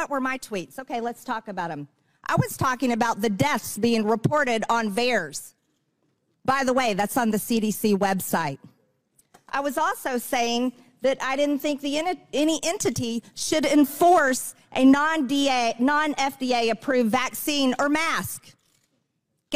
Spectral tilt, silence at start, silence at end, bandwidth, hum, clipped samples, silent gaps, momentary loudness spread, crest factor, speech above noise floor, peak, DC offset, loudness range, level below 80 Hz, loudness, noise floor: -4 dB/octave; 0 s; 0 s; 16 kHz; none; under 0.1%; none; 11 LU; 18 dB; 52 dB; -8 dBFS; 0.4%; 5 LU; -60 dBFS; -24 LUFS; -75 dBFS